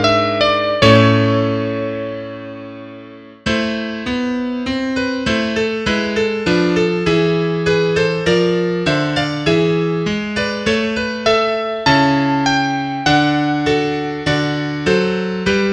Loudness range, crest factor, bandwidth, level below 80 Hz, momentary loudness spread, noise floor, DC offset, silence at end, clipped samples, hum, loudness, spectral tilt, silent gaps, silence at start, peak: 5 LU; 16 dB; 10 kHz; -42 dBFS; 8 LU; -37 dBFS; under 0.1%; 0 s; under 0.1%; none; -16 LUFS; -5.5 dB/octave; none; 0 s; 0 dBFS